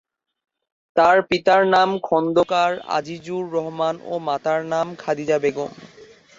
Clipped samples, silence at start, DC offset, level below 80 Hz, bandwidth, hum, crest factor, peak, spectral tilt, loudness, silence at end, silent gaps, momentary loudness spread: under 0.1%; 0.95 s; under 0.1%; -62 dBFS; 7.8 kHz; none; 18 dB; -4 dBFS; -5 dB/octave; -20 LUFS; 0.35 s; none; 10 LU